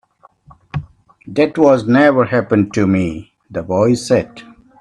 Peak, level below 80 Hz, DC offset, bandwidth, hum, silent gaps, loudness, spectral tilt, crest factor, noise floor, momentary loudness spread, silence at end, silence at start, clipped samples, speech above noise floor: 0 dBFS; -48 dBFS; under 0.1%; 11.5 kHz; none; none; -14 LUFS; -7 dB/octave; 16 dB; -47 dBFS; 17 LU; 0.4 s; 0.75 s; under 0.1%; 33 dB